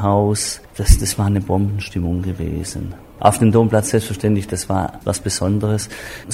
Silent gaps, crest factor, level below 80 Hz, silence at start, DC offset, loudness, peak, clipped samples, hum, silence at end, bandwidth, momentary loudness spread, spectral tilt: none; 18 dB; -26 dBFS; 0 s; under 0.1%; -19 LUFS; 0 dBFS; under 0.1%; none; 0 s; 16 kHz; 10 LU; -5.5 dB/octave